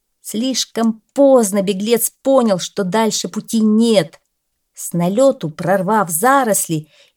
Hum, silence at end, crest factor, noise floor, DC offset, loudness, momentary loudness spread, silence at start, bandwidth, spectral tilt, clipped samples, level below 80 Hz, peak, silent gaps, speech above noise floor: none; 0.35 s; 16 dB; -71 dBFS; under 0.1%; -16 LUFS; 9 LU; 0.25 s; 19 kHz; -4.5 dB/octave; under 0.1%; -68 dBFS; 0 dBFS; none; 55 dB